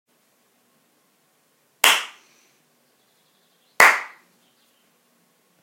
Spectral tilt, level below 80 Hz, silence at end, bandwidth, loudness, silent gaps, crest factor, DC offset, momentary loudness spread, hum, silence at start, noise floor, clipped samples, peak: 1.5 dB/octave; -68 dBFS; 1.55 s; 16.5 kHz; -16 LUFS; none; 26 dB; under 0.1%; 22 LU; none; 1.85 s; -64 dBFS; under 0.1%; 0 dBFS